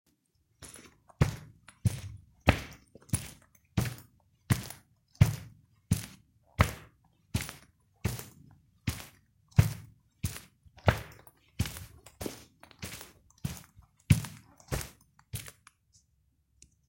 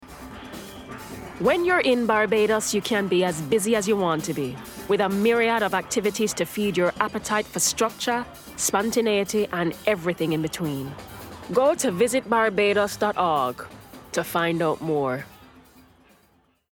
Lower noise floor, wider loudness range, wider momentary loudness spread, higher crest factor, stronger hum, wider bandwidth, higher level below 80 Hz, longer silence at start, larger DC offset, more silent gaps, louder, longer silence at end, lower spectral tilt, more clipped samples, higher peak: first, -73 dBFS vs -62 dBFS; about the same, 4 LU vs 3 LU; first, 22 LU vs 17 LU; first, 30 dB vs 20 dB; neither; second, 16.5 kHz vs 19 kHz; first, -48 dBFS vs -56 dBFS; first, 0.6 s vs 0 s; neither; neither; second, -33 LUFS vs -23 LUFS; about the same, 1.4 s vs 1.35 s; first, -5.5 dB/octave vs -4 dB/octave; neither; about the same, -6 dBFS vs -4 dBFS